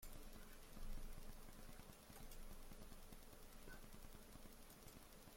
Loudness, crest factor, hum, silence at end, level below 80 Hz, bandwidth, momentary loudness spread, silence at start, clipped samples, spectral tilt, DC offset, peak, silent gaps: -61 LUFS; 16 dB; none; 0 s; -58 dBFS; 16.5 kHz; 4 LU; 0 s; under 0.1%; -4 dB/octave; under 0.1%; -40 dBFS; none